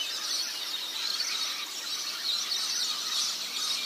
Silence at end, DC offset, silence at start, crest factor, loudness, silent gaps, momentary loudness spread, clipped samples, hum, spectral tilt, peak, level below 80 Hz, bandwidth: 0 s; under 0.1%; 0 s; 16 dB; -29 LUFS; none; 4 LU; under 0.1%; none; 3 dB/octave; -16 dBFS; -86 dBFS; 15.5 kHz